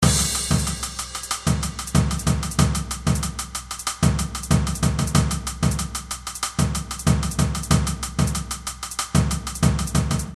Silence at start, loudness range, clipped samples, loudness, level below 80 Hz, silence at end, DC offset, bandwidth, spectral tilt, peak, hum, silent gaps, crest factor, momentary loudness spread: 0 s; 1 LU; under 0.1%; -23 LUFS; -30 dBFS; 0 s; under 0.1%; 14 kHz; -4.5 dB/octave; -4 dBFS; none; none; 18 dB; 7 LU